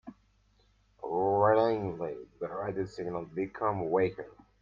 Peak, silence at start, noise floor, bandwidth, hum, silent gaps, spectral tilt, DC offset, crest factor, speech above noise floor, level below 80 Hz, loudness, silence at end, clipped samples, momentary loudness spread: -12 dBFS; 0.05 s; -67 dBFS; 7.4 kHz; none; none; -8.5 dB/octave; under 0.1%; 20 dB; 35 dB; -64 dBFS; -31 LUFS; 0.3 s; under 0.1%; 15 LU